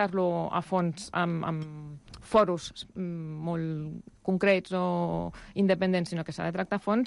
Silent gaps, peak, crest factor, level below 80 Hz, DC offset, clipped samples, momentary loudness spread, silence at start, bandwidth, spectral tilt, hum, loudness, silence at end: none; -12 dBFS; 18 dB; -58 dBFS; under 0.1%; under 0.1%; 12 LU; 0 s; 11.5 kHz; -6.5 dB/octave; none; -29 LUFS; 0 s